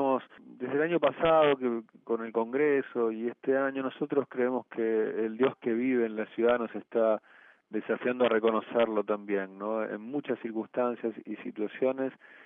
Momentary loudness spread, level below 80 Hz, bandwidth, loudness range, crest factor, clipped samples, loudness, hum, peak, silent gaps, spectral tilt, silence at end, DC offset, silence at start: 9 LU; -70 dBFS; 3.8 kHz; 4 LU; 16 dB; under 0.1%; -30 LUFS; none; -14 dBFS; none; -4 dB/octave; 0.3 s; under 0.1%; 0 s